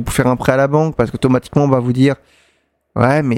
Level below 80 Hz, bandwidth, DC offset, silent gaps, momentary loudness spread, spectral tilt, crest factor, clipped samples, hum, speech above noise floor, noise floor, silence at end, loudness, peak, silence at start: -38 dBFS; 16.5 kHz; under 0.1%; none; 4 LU; -7 dB/octave; 14 dB; under 0.1%; none; 46 dB; -61 dBFS; 0 s; -15 LUFS; 0 dBFS; 0 s